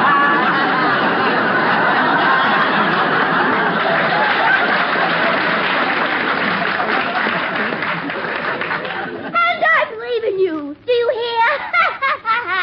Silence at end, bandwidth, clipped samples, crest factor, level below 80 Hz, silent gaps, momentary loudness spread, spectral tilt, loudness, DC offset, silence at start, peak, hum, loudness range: 0 s; 6.8 kHz; under 0.1%; 14 dB; -60 dBFS; none; 7 LU; -7 dB/octave; -16 LUFS; under 0.1%; 0 s; -2 dBFS; none; 4 LU